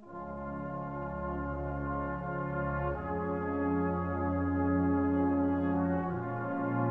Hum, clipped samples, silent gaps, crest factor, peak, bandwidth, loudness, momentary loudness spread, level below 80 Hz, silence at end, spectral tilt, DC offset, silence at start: none; under 0.1%; none; 12 dB; -20 dBFS; 3.5 kHz; -33 LUFS; 9 LU; -48 dBFS; 0 s; -11 dB/octave; 0.1%; 0 s